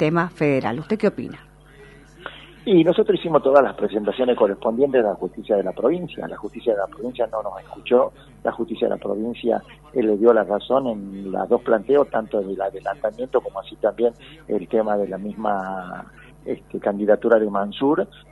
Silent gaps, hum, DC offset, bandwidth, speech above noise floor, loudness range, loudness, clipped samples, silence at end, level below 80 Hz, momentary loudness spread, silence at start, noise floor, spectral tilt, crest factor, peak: none; none; under 0.1%; 11.5 kHz; 25 dB; 5 LU; -21 LUFS; under 0.1%; 0.25 s; -54 dBFS; 15 LU; 0 s; -46 dBFS; -8 dB/octave; 20 dB; -2 dBFS